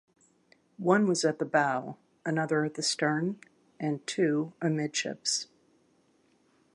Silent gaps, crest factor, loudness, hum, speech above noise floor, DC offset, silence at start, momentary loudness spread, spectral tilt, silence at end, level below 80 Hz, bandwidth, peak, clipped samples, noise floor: none; 22 dB; -29 LUFS; none; 39 dB; under 0.1%; 0.8 s; 9 LU; -4 dB/octave; 1.3 s; -80 dBFS; 11.5 kHz; -10 dBFS; under 0.1%; -68 dBFS